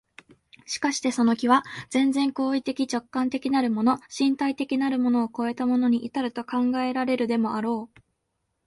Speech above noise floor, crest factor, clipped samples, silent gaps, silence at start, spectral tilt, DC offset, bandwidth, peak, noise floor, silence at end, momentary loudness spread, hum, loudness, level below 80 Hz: 53 dB; 18 dB; under 0.1%; none; 0.7 s; -4 dB/octave; under 0.1%; 11.5 kHz; -6 dBFS; -77 dBFS; 0.8 s; 6 LU; none; -25 LUFS; -66 dBFS